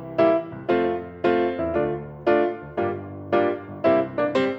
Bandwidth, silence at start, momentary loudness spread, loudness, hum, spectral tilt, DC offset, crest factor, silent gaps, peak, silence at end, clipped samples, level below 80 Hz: 7.8 kHz; 0 s; 7 LU; -23 LUFS; none; -8 dB/octave; under 0.1%; 16 dB; none; -8 dBFS; 0 s; under 0.1%; -56 dBFS